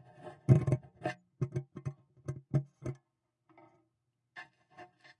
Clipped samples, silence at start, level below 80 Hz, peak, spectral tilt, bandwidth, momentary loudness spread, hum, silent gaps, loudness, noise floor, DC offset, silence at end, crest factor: under 0.1%; 0.25 s; -64 dBFS; -10 dBFS; -9 dB/octave; 9 kHz; 26 LU; none; none; -35 LUFS; -82 dBFS; under 0.1%; 0.35 s; 26 dB